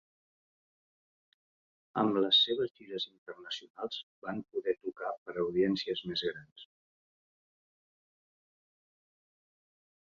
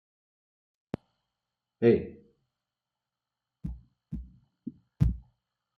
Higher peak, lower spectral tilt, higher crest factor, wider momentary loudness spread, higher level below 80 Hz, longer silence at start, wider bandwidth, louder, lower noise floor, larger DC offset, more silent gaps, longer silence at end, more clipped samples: second, -14 dBFS vs -10 dBFS; second, -5.5 dB/octave vs -10 dB/octave; about the same, 22 dB vs 24 dB; second, 16 LU vs 21 LU; second, -76 dBFS vs -44 dBFS; first, 1.95 s vs 1.8 s; first, 7.4 kHz vs 6.2 kHz; second, -33 LUFS vs -29 LUFS; about the same, under -90 dBFS vs -89 dBFS; neither; first, 2.71-2.75 s, 3.18-3.26 s, 3.70-3.74 s, 4.03-4.22 s, 5.18-5.26 s, 6.52-6.56 s vs none; first, 3.5 s vs 0.6 s; neither